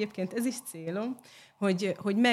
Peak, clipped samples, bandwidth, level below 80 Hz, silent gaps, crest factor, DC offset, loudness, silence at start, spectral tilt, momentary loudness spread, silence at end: -14 dBFS; under 0.1%; 14.5 kHz; -80 dBFS; none; 16 dB; under 0.1%; -32 LUFS; 0 s; -5 dB/octave; 9 LU; 0 s